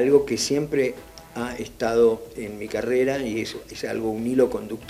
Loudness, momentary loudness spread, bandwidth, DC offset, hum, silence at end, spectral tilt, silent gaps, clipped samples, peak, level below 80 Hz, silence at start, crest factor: -24 LUFS; 13 LU; 15.5 kHz; under 0.1%; none; 0 s; -4.5 dB/octave; none; under 0.1%; -4 dBFS; -52 dBFS; 0 s; 18 dB